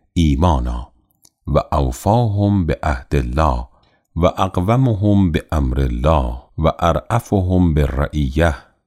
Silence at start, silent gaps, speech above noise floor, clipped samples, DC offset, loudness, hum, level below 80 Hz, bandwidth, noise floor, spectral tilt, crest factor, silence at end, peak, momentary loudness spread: 0.15 s; none; 40 dB; under 0.1%; under 0.1%; -18 LUFS; none; -24 dBFS; 15.5 kHz; -56 dBFS; -7.5 dB/octave; 14 dB; 0.25 s; -2 dBFS; 5 LU